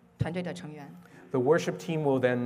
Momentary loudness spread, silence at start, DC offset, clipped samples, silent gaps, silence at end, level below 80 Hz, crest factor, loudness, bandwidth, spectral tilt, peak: 18 LU; 0.2 s; under 0.1%; under 0.1%; none; 0 s; -60 dBFS; 18 dB; -29 LUFS; 15.5 kHz; -6.5 dB/octave; -12 dBFS